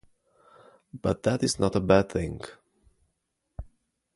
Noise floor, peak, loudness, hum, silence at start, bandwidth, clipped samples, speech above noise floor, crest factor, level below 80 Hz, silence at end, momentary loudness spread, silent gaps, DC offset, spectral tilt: -79 dBFS; -6 dBFS; -26 LUFS; none; 0.95 s; 11.5 kHz; under 0.1%; 53 dB; 24 dB; -48 dBFS; 0.55 s; 24 LU; none; under 0.1%; -5.5 dB/octave